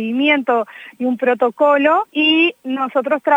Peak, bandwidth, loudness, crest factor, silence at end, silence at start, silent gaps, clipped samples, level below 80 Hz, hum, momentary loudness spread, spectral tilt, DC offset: 0 dBFS; 8.8 kHz; -16 LUFS; 16 dB; 0 s; 0 s; none; under 0.1%; -78 dBFS; none; 9 LU; -5 dB/octave; under 0.1%